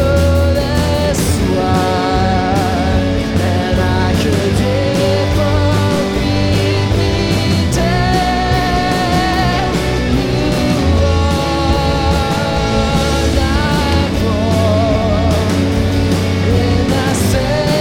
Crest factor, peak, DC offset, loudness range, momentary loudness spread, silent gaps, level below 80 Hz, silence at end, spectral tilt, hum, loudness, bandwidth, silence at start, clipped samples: 12 dB; 0 dBFS; 0.3%; 0 LU; 2 LU; none; -22 dBFS; 0 s; -6 dB/octave; none; -14 LUFS; 17 kHz; 0 s; under 0.1%